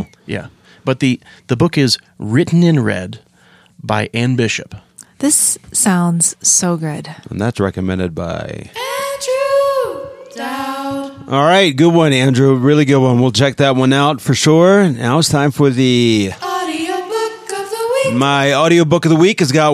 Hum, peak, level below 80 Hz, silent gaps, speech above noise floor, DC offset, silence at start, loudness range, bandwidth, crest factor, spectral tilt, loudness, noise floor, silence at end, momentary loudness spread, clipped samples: none; 0 dBFS; -50 dBFS; none; 36 dB; under 0.1%; 0 s; 7 LU; 15.5 kHz; 14 dB; -4.5 dB/octave; -14 LUFS; -49 dBFS; 0 s; 13 LU; under 0.1%